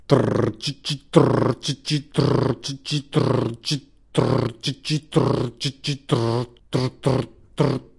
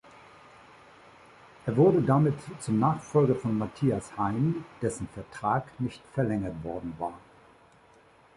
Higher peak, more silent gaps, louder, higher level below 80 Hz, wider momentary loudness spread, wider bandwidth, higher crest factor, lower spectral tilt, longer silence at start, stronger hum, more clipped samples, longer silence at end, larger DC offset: first, 0 dBFS vs -10 dBFS; neither; first, -23 LUFS vs -28 LUFS; first, -50 dBFS vs -56 dBFS; second, 8 LU vs 13 LU; about the same, 11.5 kHz vs 11.5 kHz; about the same, 22 dB vs 20 dB; second, -6 dB/octave vs -8 dB/octave; second, 0.1 s vs 1.65 s; neither; neither; second, 0.15 s vs 1.2 s; neither